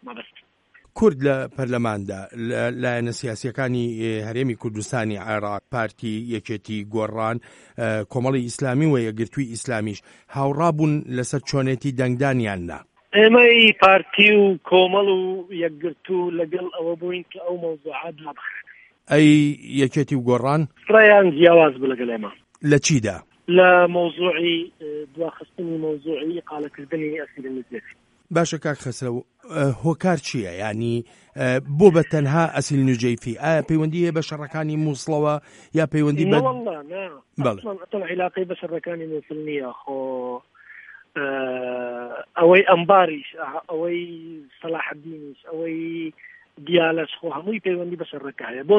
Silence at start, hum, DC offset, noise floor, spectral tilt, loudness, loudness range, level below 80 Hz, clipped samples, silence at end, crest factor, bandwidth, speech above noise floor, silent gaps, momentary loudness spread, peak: 0.05 s; none; under 0.1%; -57 dBFS; -5.5 dB/octave; -20 LUFS; 12 LU; -58 dBFS; under 0.1%; 0 s; 20 dB; 11 kHz; 36 dB; none; 18 LU; 0 dBFS